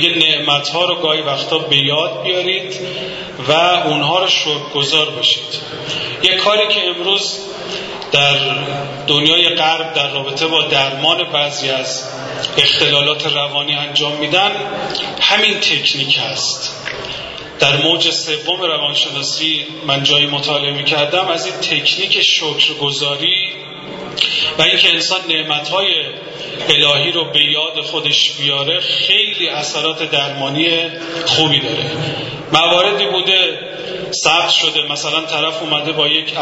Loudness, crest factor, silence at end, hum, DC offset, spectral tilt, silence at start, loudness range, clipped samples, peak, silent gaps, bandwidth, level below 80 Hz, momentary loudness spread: -13 LUFS; 16 dB; 0 s; none; under 0.1%; -2.5 dB/octave; 0 s; 2 LU; under 0.1%; 0 dBFS; none; 11 kHz; -54 dBFS; 11 LU